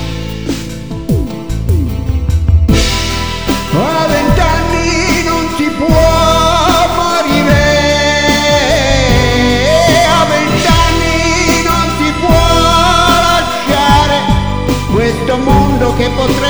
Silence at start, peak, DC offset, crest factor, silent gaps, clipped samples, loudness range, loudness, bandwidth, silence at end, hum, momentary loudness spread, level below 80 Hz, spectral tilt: 0 s; 0 dBFS; 3%; 10 dB; none; 0.1%; 4 LU; -10 LUFS; over 20 kHz; 0 s; none; 8 LU; -18 dBFS; -4.5 dB/octave